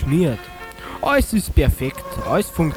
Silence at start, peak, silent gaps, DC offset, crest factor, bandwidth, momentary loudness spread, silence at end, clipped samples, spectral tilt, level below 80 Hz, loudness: 0 s; -2 dBFS; none; under 0.1%; 18 dB; 20 kHz; 14 LU; 0 s; under 0.1%; -6 dB/octave; -26 dBFS; -20 LUFS